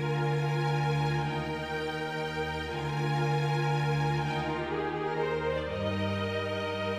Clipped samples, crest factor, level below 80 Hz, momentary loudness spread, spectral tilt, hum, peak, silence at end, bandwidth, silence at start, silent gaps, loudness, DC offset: under 0.1%; 12 dB; -52 dBFS; 5 LU; -6.5 dB/octave; none; -18 dBFS; 0 s; 11.5 kHz; 0 s; none; -31 LUFS; under 0.1%